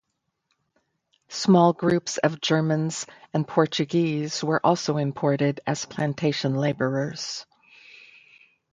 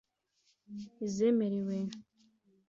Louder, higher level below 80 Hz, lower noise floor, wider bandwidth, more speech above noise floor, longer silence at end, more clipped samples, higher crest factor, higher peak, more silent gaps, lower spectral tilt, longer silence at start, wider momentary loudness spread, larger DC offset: first, -24 LUFS vs -33 LUFS; first, -66 dBFS vs -78 dBFS; about the same, -76 dBFS vs -75 dBFS; first, 9.4 kHz vs 7.6 kHz; first, 53 dB vs 43 dB; first, 1.3 s vs 0.7 s; neither; about the same, 20 dB vs 16 dB; first, -4 dBFS vs -20 dBFS; neither; second, -5.5 dB/octave vs -7 dB/octave; first, 1.3 s vs 0.7 s; second, 9 LU vs 19 LU; neither